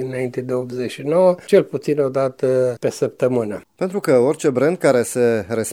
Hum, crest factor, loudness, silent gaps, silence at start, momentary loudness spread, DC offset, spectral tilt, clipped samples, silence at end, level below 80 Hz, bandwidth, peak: none; 16 dB; -19 LUFS; none; 0 s; 9 LU; under 0.1%; -6 dB/octave; under 0.1%; 0 s; -62 dBFS; 17.5 kHz; -2 dBFS